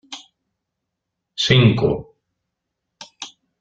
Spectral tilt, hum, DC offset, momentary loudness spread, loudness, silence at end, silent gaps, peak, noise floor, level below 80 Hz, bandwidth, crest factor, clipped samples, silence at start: -5.5 dB/octave; none; under 0.1%; 23 LU; -17 LUFS; 0.3 s; none; -2 dBFS; -80 dBFS; -48 dBFS; 7.8 kHz; 20 dB; under 0.1%; 0.1 s